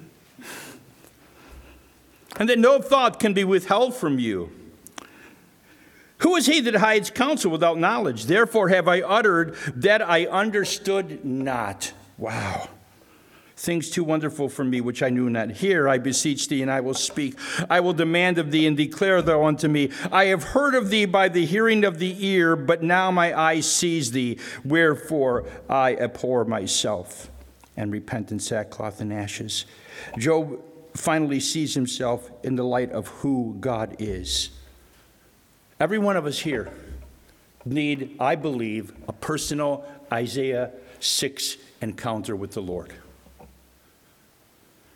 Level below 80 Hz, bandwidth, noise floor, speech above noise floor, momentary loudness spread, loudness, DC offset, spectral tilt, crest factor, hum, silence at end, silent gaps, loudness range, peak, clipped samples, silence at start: -52 dBFS; 18.5 kHz; -58 dBFS; 35 dB; 14 LU; -23 LUFS; under 0.1%; -4 dB/octave; 20 dB; none; 1.5 s; none; 8 LU; -2 dBFS; under 0.1%; 0 s